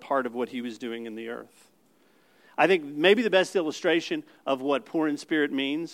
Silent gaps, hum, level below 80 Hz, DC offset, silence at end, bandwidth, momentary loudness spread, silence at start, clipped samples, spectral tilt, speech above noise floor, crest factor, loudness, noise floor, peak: none; none; -86 dBFS; under 0.1%; 0 s; 15.5 kHz; 14 LU; 0 s; under 0.1%; -4.5 dB/octave; 37 dB; 22 dB; -26 LUFS; -63 dBFS; -6 dBFS